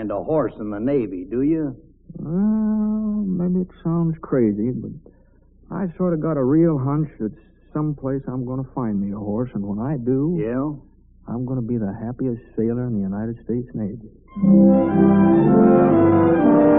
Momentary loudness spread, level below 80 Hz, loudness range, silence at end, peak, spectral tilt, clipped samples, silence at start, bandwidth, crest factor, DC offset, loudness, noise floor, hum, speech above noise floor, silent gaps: 14 LU; -46 dBFS; 9 LU; 0 s; -2 dBFS; -8 dB/octave; under 0.1%; 0 s; 3.6 kHz; 18 dB; under 0.1%; -20 LUFS; -52 dBFS; none; 31 dB; none